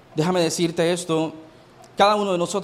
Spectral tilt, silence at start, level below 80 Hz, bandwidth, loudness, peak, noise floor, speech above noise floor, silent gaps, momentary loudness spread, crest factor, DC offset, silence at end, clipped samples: -4.5 dB/octave; 0.15 s; -62 dBFS; 15.5 kHz; -21 LUFS; -4 dBFS; -48 dBFS; 27 dB; none; 7 LU; 18 dB; under 0.1%; 0 s; under 0.1%